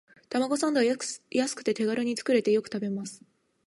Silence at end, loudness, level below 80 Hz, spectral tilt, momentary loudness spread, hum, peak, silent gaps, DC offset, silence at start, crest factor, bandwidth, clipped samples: 0.5 s; -28 LUFS; -80 dBFS; -4 dB/octave; 8 LU; none; -12 dBFS; none; under 0.1%; 0.3 s; 16 dB; 11.5 kHz; under 0.1%